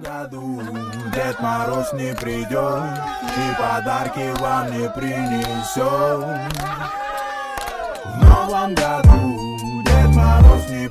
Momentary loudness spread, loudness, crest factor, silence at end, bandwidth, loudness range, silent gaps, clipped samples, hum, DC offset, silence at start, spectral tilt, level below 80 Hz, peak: 14 LU; -19 LUFS; 16 dB; 0 s; 15.5 kHz; 8 LU; none; under 0.1%; none; under 0.1%; 0 s; -6.5 dB/octave; -20 dBFS; 0 dBFS